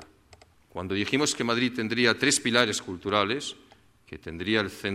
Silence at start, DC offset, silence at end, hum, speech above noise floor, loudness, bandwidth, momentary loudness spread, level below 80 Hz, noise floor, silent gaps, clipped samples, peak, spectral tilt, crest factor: 0 s; under 0.1%; 0 s; none; 30 dB; -25 LUFS; 15.5 kHz; 17 LU; -60 dBFS; -57 dBFS; none; under 0.1%; -6 dBFS; -3 dB/octave; 22 dB